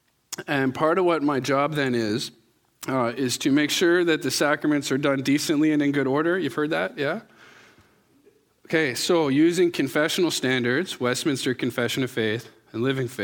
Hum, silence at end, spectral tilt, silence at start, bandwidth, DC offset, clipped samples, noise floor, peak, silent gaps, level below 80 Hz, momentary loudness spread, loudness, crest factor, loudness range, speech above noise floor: none; 0 s; -4.5 dB/octave; 0.3 s; 18.5 kHz; under 0.1%; under 0.1%; -60 dBFS; -6 dBFS; none; -68 dBFS; 8 LU; -23 LUFS; 16 dB; 4 LU; 37 dB